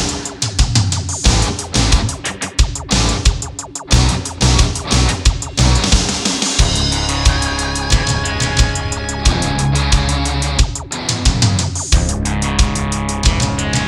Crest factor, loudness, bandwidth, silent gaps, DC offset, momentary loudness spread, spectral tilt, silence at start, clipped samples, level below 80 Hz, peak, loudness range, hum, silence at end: 14 dB; -16 LUFS; 12.5 kHz; none; under 0.1%; 5 LU; -3.5 dB/octave; 0 s; under 0.1%; -18 dBFS; 0 dBFS; 2 LU; none; 0 s